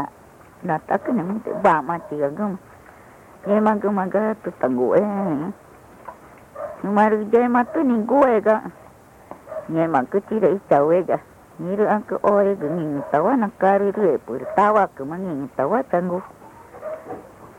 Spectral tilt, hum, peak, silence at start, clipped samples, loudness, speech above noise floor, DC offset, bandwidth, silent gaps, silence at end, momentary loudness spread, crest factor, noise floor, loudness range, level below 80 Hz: -8.5 dB/octave; none; -6 dBFS; 0 s; under 0.1%; -20 LUFS; 27 dB; under 0.1%; 15.5 kHz; none; 0.05 s; 17 LU; 16 dB; -47 dBFS; 3 LU; -60 dBFS